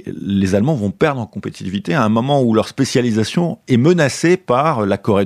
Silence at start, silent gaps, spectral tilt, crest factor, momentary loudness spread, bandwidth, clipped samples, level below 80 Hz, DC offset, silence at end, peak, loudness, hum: 0.05 s; none; -6 dB/octave; 14 dB; 7 LU; 13.5 kHz; under 0.1%; -54 dBFS; under 0.1%; 0 s; -2 dBFS; -16 LUFS; none